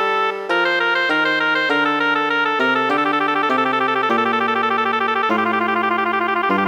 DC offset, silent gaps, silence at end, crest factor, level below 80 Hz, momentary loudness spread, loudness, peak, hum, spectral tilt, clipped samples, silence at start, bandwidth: under 0.1%; none; 0 s; 12 dB; -66 dBFS; 2 LU; -17 LUFS; -6 dBFS; none; -4.5 dB/octave; under 0.1%; 0 s; 19.5 kHz